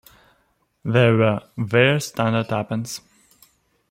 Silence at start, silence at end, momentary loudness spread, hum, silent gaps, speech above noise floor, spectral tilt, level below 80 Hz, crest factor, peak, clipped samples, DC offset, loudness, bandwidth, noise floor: 0.85 s; 0.9 s; 14 LU; none; none; 46 dB; -6 dB/octave; -60 dBFS; 20 dB; -2 dBFS; under 0.1%; under 0.1%; -20 LUFS; 16 kHz; -65 dBFS